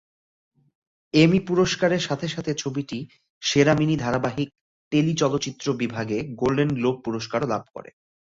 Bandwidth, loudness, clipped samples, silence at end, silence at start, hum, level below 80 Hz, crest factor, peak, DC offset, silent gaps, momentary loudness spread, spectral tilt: 7.8 kHz; -23 LUFS; under 0.1%; 0.45 s; 1.15 s; none; -54 dBFS; 20 dB; -4 dBFS; under 0.1%; 3.30-3.41 s, 4.61-4.91 s; 12 LU; -5.5 dB/octave